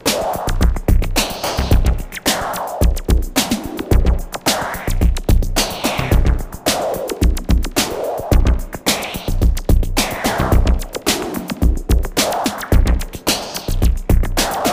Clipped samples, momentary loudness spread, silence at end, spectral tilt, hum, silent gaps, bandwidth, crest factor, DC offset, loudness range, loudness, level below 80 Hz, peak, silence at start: under 0.1%; 4 LU; 0 s; -4.5 dB/octave; none; none; 16 kHz; 16 dB; under 0.1%; 1 LU; -18 LUFS; -18 dBFS; 0 dBFS; 0.05 s